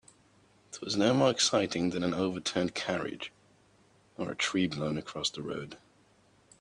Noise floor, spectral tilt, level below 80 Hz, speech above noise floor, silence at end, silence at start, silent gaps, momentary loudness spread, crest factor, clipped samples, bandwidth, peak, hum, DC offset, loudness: -65 dBFS; -4 dB/octave; -66 dBFS; 34 dB; 0.85 s; 0.7 s; none; 16 LU; 20 dB; under 0.1%; 10.5 kHz; -12 dBFS; none; under 0.1%; -31 LUFS